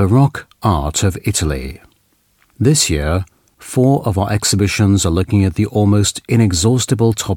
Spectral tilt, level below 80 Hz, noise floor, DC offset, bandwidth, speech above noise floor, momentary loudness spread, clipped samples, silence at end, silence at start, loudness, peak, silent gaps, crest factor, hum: -5 dB/octave; -32 dBFS; -58 dBFS; under 0.1%; 17 kHz; 44 dB; 7 LU; under 0.1%; 0 s; 0 s; -15 LUFS; -2 dBFS; none; 14 dB; none